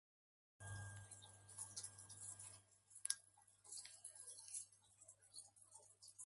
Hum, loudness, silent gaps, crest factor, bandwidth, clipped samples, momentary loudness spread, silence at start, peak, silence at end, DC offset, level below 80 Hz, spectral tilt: none; -54 LUFS; none; 38 dB; 11.5 kHz; under 0.1%; 17 LU; 0.6 s; -20 dBFS; 0 s; under 0.1%; -78 dBFS; -1 dB/octave